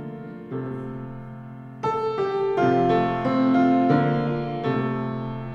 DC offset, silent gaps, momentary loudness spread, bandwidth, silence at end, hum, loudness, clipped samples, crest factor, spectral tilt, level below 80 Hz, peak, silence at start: under 0.1%; none; 18 LU; 7 kHz; 0 s; none; -23 LUFS; under 0.1%; 16 dB; -9 dB/octave; -52 dBFS; -8 dBFS; 0 s